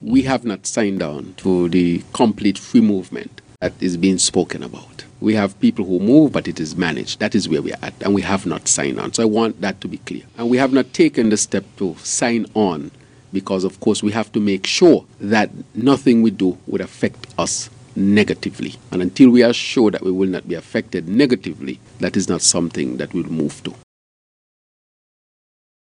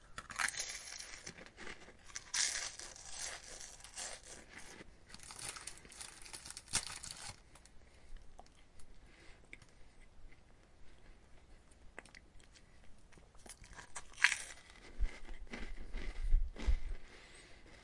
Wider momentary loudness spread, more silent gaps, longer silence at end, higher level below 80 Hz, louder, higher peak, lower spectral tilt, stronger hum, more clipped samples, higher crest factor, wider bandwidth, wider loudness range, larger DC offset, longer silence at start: second, 13 LU vs 25 LU; neither; first, 2.05 s vs 0 s; second, -52 dBFS vs -46 dBFS; first, -18 LUFS vs -42 LUFS; first, 0 dBFS vs -8 dBFS; first, -4.5 dB/octave vs -1 dB/octave; neither; neither; second, 18 dB vs 34 dB; about the same, 10.5 kHz vs 11.5 kHz; second, 3 LU vs 21 LU; neither; about the same, 0 s vs 0 s